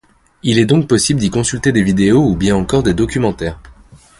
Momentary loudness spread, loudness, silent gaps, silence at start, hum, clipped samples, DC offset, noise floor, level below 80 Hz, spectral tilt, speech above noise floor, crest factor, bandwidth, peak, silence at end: 6 LU; -14 LUFS; none; 0.45 s; none; under 0.1%; under 0.1%; -42 dBFS; -34 dBFS; -5.5 dB/octave; 29 dB; 14 dB; 11.5 kHz; 0 dBFS; 0.5 s